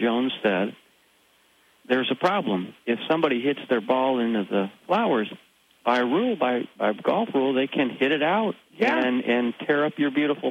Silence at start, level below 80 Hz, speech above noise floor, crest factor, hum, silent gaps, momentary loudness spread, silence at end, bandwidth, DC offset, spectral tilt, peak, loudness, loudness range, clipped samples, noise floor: 0 s; -78 dBFS; 38 dB; 16 dB; none; none; 5 LU; 0 s; 10.5 kHz; under 0.1%; -6.5 dB/octave; -8 dBFS; -24 LUFS; 3 LU; under 0.1%; -61 dBFS